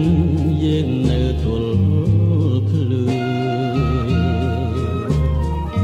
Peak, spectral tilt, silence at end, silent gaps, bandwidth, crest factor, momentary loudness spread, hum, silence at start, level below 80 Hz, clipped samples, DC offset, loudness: -4 dBFS; -8.5 dB/octave; 0 s; none; 8.8 kHz; 12 dB; 4 LU; none; 0 s; -26 dBFS; under 0.1%; under 0.1%; -18 LUFS